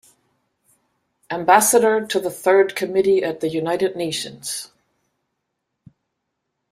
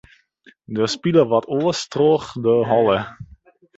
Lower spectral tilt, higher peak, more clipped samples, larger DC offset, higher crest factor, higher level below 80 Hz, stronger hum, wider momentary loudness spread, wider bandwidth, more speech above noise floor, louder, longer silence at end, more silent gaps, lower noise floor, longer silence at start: second, -3 dB/octave vs -6 dB/octave; about the same, -2 dBFS vs -2 dBFS; neither; neither; about the same, 20 dB vs 18 dB; second, -66 dBFS vs -54 dBFS; neither; first, 14 LU vs 7 LU; first, 16 kHz vs 8 kHz; first, 59 dB vs 36 dB; about the same, -19 LUFS vs -19 LUFS; first, 2.05 s vs 0.55 s; neither; first, -77 dBFS vs -54 dBFS; first, 1.3 s vs 0.7 s